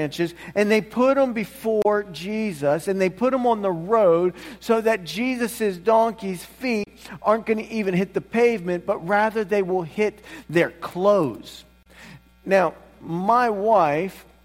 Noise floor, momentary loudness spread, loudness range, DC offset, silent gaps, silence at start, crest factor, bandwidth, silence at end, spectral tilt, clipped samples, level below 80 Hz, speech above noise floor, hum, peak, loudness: -46 dBFS; 9 LU; 2 LU; under 0.1%; none; 0 s; 16 dB; 16.5 kHz; 0.25 s; -6 dB/octave; under 0.1%; -56 dBFS; 24 dB; none; -6 dBFS; -22 LUFS